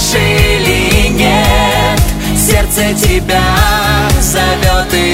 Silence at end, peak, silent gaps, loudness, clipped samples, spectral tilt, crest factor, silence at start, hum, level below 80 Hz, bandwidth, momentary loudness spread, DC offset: 0 s; 0 dBFS; none; -10 LUFS; under 0.1%; -4 dB/octave; 10 dB; 0 s; none; -16 dBFS; 16.5 kHz; 2 LU; 0.5%